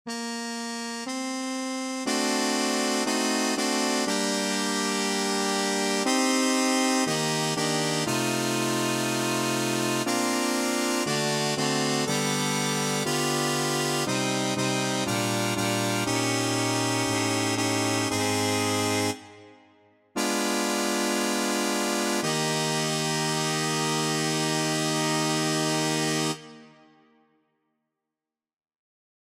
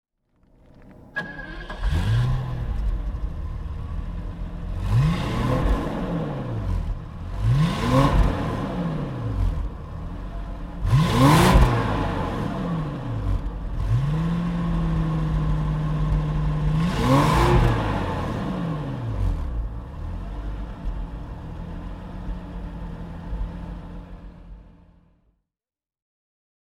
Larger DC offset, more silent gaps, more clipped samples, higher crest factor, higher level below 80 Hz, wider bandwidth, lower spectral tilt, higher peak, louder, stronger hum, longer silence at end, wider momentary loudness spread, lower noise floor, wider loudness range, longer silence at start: neither; neither; neither; second, 16 dB vs 22 dB; second, -68 dBFS vs -28 dBFS; about the same, 16 kHz vs 16 kHz; second, -3 dB/octave vs -7 dB/octave; second, -10 dBFS vs -2 dBFS; about the same, -25 LUFS vs -25 LUFS; neither; first, 2.7 s vs 2.1 s; second, 3 LU vs 17 LU; about the same, -89 dBFS vs under -90 dBFS; second, 3 LU vs 14 LU; second, 0.05 s vs 0.8 s